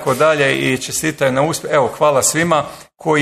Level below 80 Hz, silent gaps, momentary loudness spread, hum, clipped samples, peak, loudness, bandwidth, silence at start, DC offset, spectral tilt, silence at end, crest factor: -52 dBFS; none; 6 LU; none; under 0.1%; -2 dBFS; -15 LUFS; 14 kHz; 0 s; under 0.1%; -3.5 dB/octave; 0 s; 14 dB